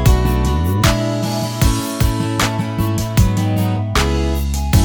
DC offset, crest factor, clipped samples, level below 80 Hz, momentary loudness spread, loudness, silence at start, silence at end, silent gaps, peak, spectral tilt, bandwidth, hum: under 0.1%; 14 dB; under 0.1%; -20 dBFS; 4 LU; -17 LUFS; 0 s; 0 s; none; 0 dBFS; -5.5 dB/octave; over 20 kHz; none